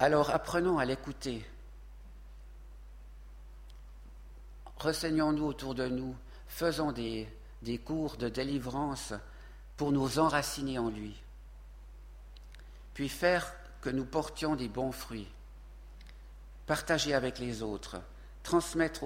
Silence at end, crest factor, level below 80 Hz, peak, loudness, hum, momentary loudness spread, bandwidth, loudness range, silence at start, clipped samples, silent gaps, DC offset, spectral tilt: 0 s; 24 dB; -50 dBFS; -10 dBFS; -34 LUFS; none; 24 LU; 16.5 kHz; 5 LU; 0 s; under 0.1%; none; under 0.1%; -5 dB/octave